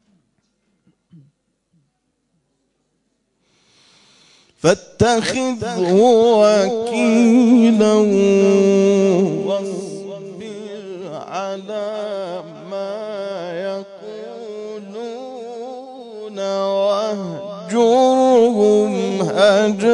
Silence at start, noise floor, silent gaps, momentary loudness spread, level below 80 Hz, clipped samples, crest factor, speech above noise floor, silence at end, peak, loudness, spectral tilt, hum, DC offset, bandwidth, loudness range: 4.65 s; -69 dBFS; none; 19 LU; -58 dBFS; under 0.1%; 16 dB; 55 dB; 0 s; 0 dBFS; -16 LUFS; -5.5 dB/octave; none; under 0.1%; 11 kHz; 14 LU